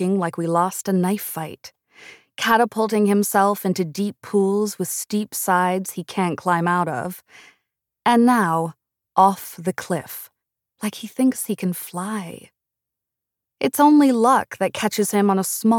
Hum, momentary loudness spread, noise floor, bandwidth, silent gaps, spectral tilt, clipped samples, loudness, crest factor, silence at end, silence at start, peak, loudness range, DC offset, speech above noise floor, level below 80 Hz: none; 13 LU; -85 dBFS; 19 kHz; none; -5 dB/octave; under 0.1%; -20 LUFS; 18 dB; 0 s; 0 s; -4 dBFS; 6 LU; under 0.1%; 65 dB; -70 dBFS